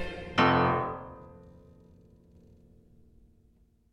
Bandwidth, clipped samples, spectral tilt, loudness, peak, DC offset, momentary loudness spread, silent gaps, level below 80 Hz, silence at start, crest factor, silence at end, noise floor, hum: 9 kHz; under 0.1%; -6.5 dB/octave; -27 LUFS; -10 dBFS; under 0.1%; 26 LU; none; -54 dBFS; 0 s; 22 dB; 2.4 s; -64 dBFS; none